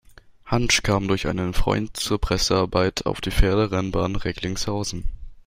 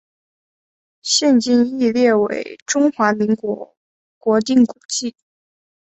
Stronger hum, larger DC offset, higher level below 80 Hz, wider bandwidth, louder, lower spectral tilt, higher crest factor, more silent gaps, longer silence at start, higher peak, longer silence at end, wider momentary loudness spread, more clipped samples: neither; neither; first, -30 dBFS vs -64 dBFS; first, 16 kHz vs 8.2 kHz; second, -23 LUFS vs -17 LUFS; about the same, -4.5 dB/octave vs -3.5 dB/octave; about the same, 18 dB vs 16 dB; second, none vs 2.62-2.66 s, 3.77-4.21 s, 4.85-4.89 s; second, 0.45 s vs 1.05 s; about the same, -4 dBFS vs -2 dBFS; second, 0.05 s vs 0.75 s; second, 8 LU vs 12 LU; neither